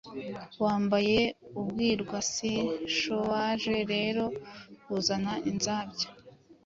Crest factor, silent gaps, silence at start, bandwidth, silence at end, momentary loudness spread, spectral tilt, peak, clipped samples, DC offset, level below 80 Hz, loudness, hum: 18 dB; none; 0.05 s; 7.8 kHz; 0.15 s; 11 LU; -4 dB/octave; -12 dBFS; under 0.1%; under 0.1%; -60 dBFS; -30 LUFS; none